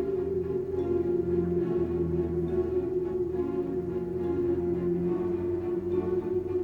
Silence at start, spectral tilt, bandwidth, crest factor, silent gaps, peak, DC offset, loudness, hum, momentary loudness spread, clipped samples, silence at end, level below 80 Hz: 0 s; -10.5 dB/octave; 3.8 kHz; 12 dB; none; -16 dBFS; under 0.1%; -29 LUFS; none; 3 LU; under 0.1%; 0 s; -48 dBFS